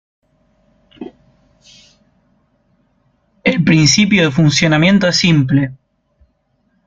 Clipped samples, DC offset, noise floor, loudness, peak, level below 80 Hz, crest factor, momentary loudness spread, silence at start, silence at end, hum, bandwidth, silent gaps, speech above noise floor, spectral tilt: under 0.1%; under 0.1%; -62 dBFS; -12 LUFS; 0 dBFS; -46 dBFS; 16 dB; 24 LU; 1 s; 1.1 s; none; 8.8 kHz; none; 50 dB; -4.5 dB/octave